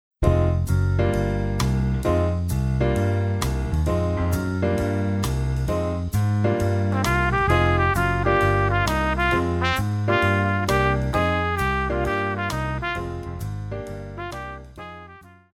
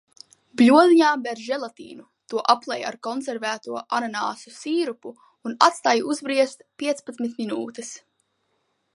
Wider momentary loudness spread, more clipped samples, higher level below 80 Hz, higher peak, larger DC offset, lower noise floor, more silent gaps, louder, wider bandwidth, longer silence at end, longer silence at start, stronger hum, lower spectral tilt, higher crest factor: second, 12 LU vs 20 LU; neither; first, -32 dBFS vs -76 dBFS; second, -6 dBFS vs 0 dBFS; neither; second, -46 dBFS vs -72 dBFS; neither; about the same, -22 LUFS vs -22 LUFS; first, 16 kHz vs 11.5 kHz; second, 0.25 s vs 1 s; second, 0.2 s vs 0.6 s; neither; first, -6.5 dB/octave vs -3.5 dB/octave; second, 16 dB vs 22 dB